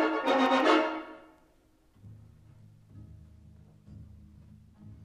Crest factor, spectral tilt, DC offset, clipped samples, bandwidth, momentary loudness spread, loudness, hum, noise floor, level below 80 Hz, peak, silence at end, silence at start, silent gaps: 22 dB; -5 dB/octave; under 0.1%; under 0.1%; 12.5 kHz; 28 LU; -26 LUFS; none; -65 dBFS; -62 dBFS; -10 dBFS; 0 s; 0 s; none